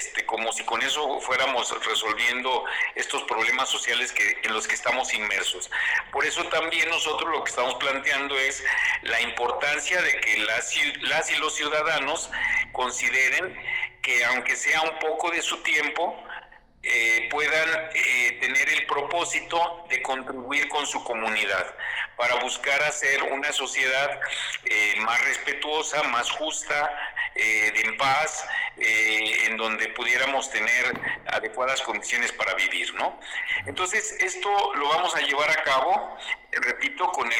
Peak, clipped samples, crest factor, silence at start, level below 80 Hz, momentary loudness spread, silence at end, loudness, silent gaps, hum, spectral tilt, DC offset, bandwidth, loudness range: -16 dBFS; under 0.1%; 10 dB; 0 s; -58 dBFS; 6 LU; 0 s; -24 LUFS; none; none; -0.5 dB/octave; under 0.1%; 19.5 kHz; 2 LU